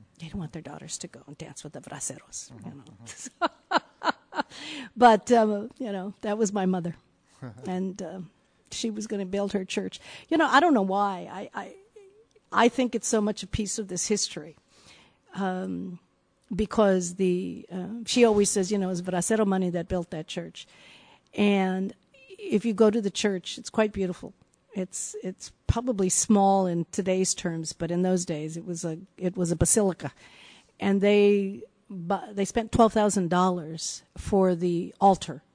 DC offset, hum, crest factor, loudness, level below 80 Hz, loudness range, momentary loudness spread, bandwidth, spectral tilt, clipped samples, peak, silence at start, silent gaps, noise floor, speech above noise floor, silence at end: under 0.1%; none; 22 dB; -26 LUFS; -50 dBFS; 7 LU; 19 LU; 10 kHz; -4.5 dB/octave; under 0.1%; -6 dBFS; 0.2 s; none; -57 dBFS; 30 dB; 0.15 s